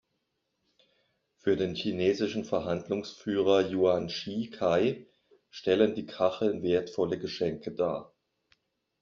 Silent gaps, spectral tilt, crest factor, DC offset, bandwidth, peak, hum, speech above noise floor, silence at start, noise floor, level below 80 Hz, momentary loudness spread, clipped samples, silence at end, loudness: none; -5 dB/octave; 20 dB; under 0.1%; 7.2 kHz; -10 dBFS; none; 51 dB; 1.45 s; -80 dBFS; -66 dBFS; 9 LU; under 0.1%; 0.95 s; -29 LUFS